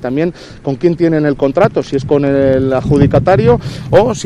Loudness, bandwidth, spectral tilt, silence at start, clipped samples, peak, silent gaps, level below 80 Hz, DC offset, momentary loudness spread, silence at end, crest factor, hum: -12 LUFS; 10.5 kHz; -7.5 dB/octave; 0 s; 0.3%; 0 dBFS; none; -32 dBFS; under 0.1%; 7 LU; 0 s; 12 dB; none